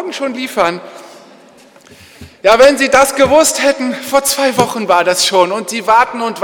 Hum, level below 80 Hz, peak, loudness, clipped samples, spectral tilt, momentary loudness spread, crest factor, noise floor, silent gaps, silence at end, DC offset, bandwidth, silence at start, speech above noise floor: none; -46 dBFS; 0 dBFS; -11 LUFS; under 0.1%; -2.5 dB/octave; 10 LU; 12 dB; -42 dBFS; none; 0 s; under 0.1%; 19.5 kHz; 0 s; 30 dB